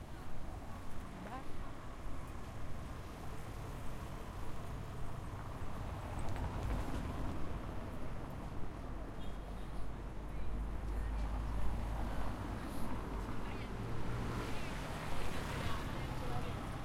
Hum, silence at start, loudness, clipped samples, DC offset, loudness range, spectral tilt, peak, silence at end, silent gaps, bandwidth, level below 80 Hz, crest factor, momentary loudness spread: none; 0 s; -45 LUFS; under 0.1%; under 0.1%; 5 LU; -6 dB/octave; -22 dBFS; 0 s; none; 15.5 kHz; -46 dBFS; 16 dB; 7 LU